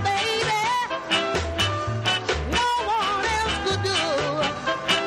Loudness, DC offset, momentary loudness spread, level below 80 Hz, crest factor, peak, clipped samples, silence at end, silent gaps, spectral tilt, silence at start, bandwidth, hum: -23 LUFS; under 0.1%; 2 LU; -40 dBFS; 14 dB; -10 dBFS; under 0.1%; 0 s; none; -3.5 dB/octave; 0 s; 15.5 kHz; none